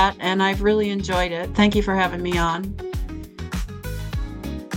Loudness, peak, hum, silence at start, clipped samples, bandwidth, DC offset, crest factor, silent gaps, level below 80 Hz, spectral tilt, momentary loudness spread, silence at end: -23 LUFS; -4 dBFS; none; 0 s; under 0.1%; 17 kHz; under 0.1%; 18 dB; none; -32 dBFS; -5.5 dB/octave; 13 LU; 0 s